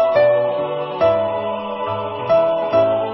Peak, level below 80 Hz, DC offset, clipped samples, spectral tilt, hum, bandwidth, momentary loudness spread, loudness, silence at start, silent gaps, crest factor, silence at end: -4 dBFS; -54 dBFS; under 0.1%; under 0.1%; -10.5 dB/octave; none; 5.8 kHz; 8 LU; -18 LUFS; 0 s; none; 14 dB; 0 s